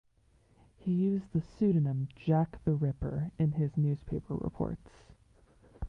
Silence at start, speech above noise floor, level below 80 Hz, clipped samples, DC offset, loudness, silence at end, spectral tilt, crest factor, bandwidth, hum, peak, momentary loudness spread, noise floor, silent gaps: 0.85 s; 35 dB; -52 dBFS; under 0.1%; under 0.1%; -32 LUFS; 0 s; -11 dB/octave; 16 dB; 5.4 kHz; none; -16 dBFS; 8 LU; -66 dBFS; none